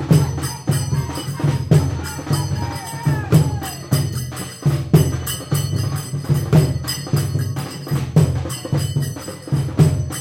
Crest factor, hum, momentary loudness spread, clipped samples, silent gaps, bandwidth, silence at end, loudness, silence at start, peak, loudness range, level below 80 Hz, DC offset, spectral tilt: 16 dB; none; 9 LU; under 0.1%; none; 16.5 kHz; 0 s; -20 LUFS; 0 s; -2 dBFS; 1 LU; -38 dBFS; under 0.1%; -6 dB/octave